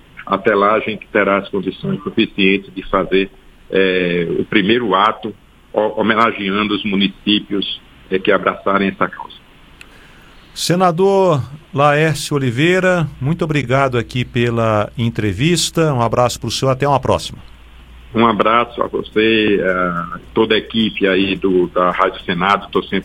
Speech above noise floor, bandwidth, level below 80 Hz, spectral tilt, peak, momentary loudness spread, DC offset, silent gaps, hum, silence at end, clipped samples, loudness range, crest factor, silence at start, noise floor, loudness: 27 dB; 16 kHz; -42 dBFS; -5.5 dB/octave; 0 dBFS; 8 LU; under 0.1%; none; none; 0 s; under 0.1%; 2 LU; 16 dB; 0.15 s; -42 dBFS; -16 LUFS